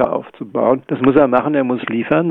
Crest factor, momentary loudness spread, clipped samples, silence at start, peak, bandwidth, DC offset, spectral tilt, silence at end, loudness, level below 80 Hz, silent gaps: 14 dB; 8 LU; under 0.1%; 0 s; -2 dBFS; 4.1 kHz; under 0.1%; -10 dB/octave; 0 s; -16 LUFS; -50 dBFS; none